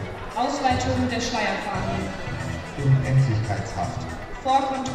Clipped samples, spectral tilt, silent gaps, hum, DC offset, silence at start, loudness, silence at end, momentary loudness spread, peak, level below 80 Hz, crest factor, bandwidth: under 0.1%; -6 dB/octave; none; none; under 0.1%; 0 s; -25 LUFS; 0 s; 10 LU; -8 dBFS; -40 dBFS; 16 dB; 10 kHz